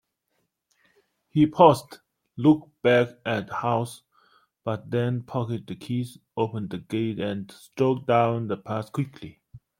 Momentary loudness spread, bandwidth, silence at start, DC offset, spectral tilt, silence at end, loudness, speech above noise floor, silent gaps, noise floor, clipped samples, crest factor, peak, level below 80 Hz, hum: 14 LU; 16 kHz; 1.35 s; under 0.1%; -7 dB/octave; 0.25 s; -25 LUFS; 51 dB; none; -76 dBFS; under 0.1%; 24 dB; -2 dBFS; -64 dBFS; none